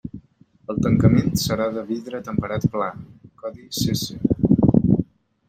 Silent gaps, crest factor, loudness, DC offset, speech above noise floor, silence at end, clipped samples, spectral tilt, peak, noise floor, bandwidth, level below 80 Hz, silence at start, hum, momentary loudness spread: none; 20 dB; -21 LUFS; under 0.1%; 31 dB; 0.45 s; under 0.1%; -6.5 dB/octave; -2 dBFS; -53 dBFS; 16.5 kHz; -42 dBFS; 0.05 s; none; 19 LU